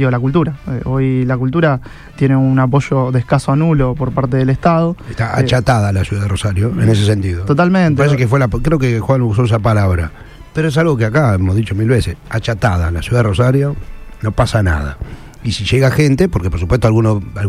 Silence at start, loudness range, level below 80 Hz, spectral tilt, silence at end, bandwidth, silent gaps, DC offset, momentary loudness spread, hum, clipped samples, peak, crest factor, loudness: 0 s; 2 LU; -30 dBFS; -7 dB/octave; 0 s; 13.5 kHz; none; under 0.1%; 8 LU; none; under 0.1%; 0 dBFS; 14 dB; -14 LUFS